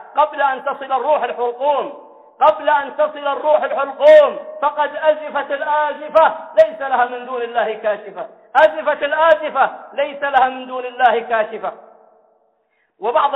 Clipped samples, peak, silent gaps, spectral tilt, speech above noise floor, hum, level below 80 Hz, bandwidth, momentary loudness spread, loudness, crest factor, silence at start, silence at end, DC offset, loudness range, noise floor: under 0.1%; -2 dBFS; none; -4 dB/octave; 48 dB; none; -66 dBFS; 5.4 kHz; 10 LU; -17 LUFS; 16 dB; 0 s; 0 s; under 0.1%; 4 LU; -64 dBFS